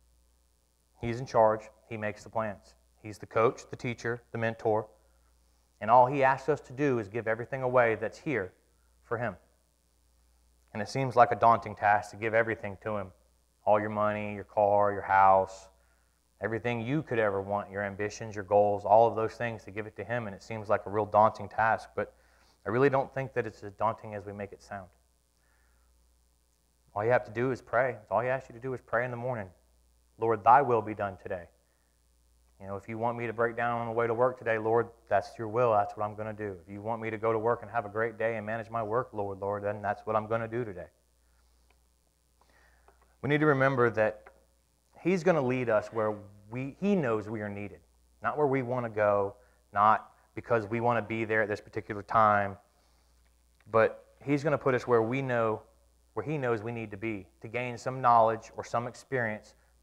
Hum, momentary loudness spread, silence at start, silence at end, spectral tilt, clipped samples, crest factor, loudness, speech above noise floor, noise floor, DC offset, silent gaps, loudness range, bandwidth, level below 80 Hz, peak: none; 15 LU; 1 s; 0.4 s; -7 dB/octave; under 0.1%; 22 dB; -29 LUFS; 41 dB; -70 dBFS; under 0.1%; none; 6 LU; 12 kHz; -64 dBFS; -8 dBFS